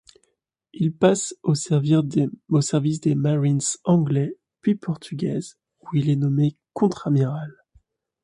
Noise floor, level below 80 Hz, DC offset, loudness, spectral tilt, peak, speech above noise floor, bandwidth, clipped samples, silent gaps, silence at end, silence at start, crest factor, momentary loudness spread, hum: -70 dBFS; -62 dBFS; under 0.1%; -22 LUFS; -6.5 dB/octave; -4 dBFS; 49 dB; 11 kHz; under 0.1%; none; 0.75 s; 0.75 s; 18 dB; 8 LU; none